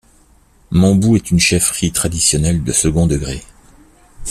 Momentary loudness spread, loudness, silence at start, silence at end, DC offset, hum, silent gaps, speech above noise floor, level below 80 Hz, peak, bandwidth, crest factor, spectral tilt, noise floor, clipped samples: 9 LU; -14 LUFS; 0.7 s; 0 s; under 0.1%; none; none; 36 dB; -32 dBFS; 0 dBFS; 14.5 kHz; 16 dB; -4.5 dB/octave; -50 dBFS; under 0.1%